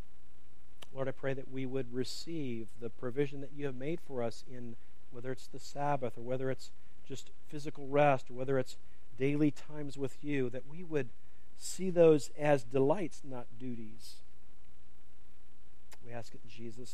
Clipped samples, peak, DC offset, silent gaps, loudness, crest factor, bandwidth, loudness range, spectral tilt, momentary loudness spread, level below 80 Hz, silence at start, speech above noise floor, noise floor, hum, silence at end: under 0.1%; -14 dBFS; 2%; none; -35 LUFS; 22 dB; 15 kHz; 9 LU; -6 dB/octave; 19 LU; -64 dBFS; 0.95 s; 27 dB; -63 dBFS; none; 0 s